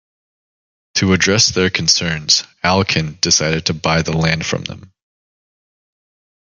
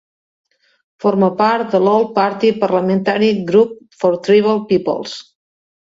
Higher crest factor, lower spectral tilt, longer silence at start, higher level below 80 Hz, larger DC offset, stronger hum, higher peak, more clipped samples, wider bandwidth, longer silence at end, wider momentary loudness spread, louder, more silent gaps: about the same, 18 dB vs 16 dB; second, -3 dB/octave vs -7 dB/octave; about the same, 0.95 s vs 1 s; first, -38 dBFS vs -60 dBFS; neither; neither; about the same, 0 dBFS vs 0 dBFS; neither; first, 11 kHz vs 7.8 kHz; first, 1.7 s vs 0.7 s; about the same, 7 LU vs 7 LU; about the same, -15 LUFS vs -15 LUFS; neither